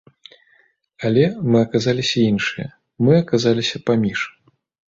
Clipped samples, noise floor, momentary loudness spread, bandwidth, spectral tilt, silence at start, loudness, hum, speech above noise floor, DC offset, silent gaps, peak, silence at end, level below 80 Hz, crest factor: under 0.1%; -59 dBFS; 10 LU; 7.8 kHz; -6 dB/octave; 1 s; -18 LUFS; none; 41 dB; under 0.1%; none; -2 dBFS; 0.6 s; -54 dBFS; 16 dB